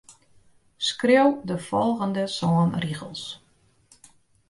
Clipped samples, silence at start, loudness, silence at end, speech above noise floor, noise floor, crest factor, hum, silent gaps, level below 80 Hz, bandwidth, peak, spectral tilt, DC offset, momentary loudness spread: under 0.1%; 0.1 s; -24 LUFS; 1.15 s; 37 dB; -60 dBFS; 20 dB; none; none; -62 dBFS; 11.5 kHz; -6 dBFS; -5.5 dB/octave; under 0.1%; 16 LU